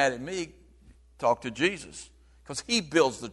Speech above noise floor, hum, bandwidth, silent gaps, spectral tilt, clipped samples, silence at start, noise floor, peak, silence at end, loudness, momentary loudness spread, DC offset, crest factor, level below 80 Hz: 28 dB; none; 11.5 kHz; none; -3.5 dB/octave; under 0.1%; 0 s; -56 dBFS; -8 dBFS; 0 s; -28 LUFS; 15 LU; under 0.1%; 22 dB; -58 dBFS